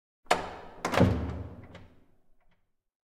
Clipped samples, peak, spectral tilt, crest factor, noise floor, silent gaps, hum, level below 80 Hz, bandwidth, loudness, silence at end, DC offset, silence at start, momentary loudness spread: under 0.1%; -8 dBFS; -6 dB/octave; 26 dB; -69 dBFS; none; none; -48 dBFS; 16 kHz; -29 LUFS; 1.25 s; under 0.1%; 0.3 s; 18 LU